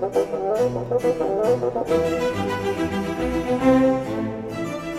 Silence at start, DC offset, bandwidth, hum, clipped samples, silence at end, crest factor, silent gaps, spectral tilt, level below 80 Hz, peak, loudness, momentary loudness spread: 0 s; under 0.1%; 14.5 kHz; none; under 0.1%; 0 s; 16 dB; none; -6.5 dB/octave; -44 dBFS; -6 dBFS; -22 LUFS; 9 LU